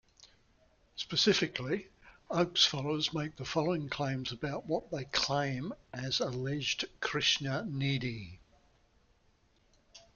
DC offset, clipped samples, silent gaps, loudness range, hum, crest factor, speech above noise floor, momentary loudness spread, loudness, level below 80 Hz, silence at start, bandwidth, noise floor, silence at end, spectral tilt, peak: under 0.1%; under 0.1%; none; 3 LU; none; 24 dB; 36 dB; 12 LU; -33 LUFS; -62 dBFS; 0.2 s; 7.4 kHz; -69 dBFS; 0.15 s; -4 dB/octave; -12 dBFS